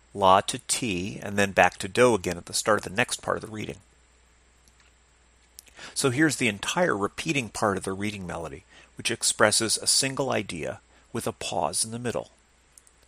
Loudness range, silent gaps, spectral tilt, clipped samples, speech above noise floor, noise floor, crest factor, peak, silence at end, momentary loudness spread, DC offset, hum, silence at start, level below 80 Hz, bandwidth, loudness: 6 LU; none; -3 dB/octave; under 0.1%; 34 dB; -60 dBFS; 26 dB; -2 dBFS; 0.85 s; 15 LU; under 0.1%; none; 0.15 s; -58 dBFS; 15.5 kHz; -25 LUFS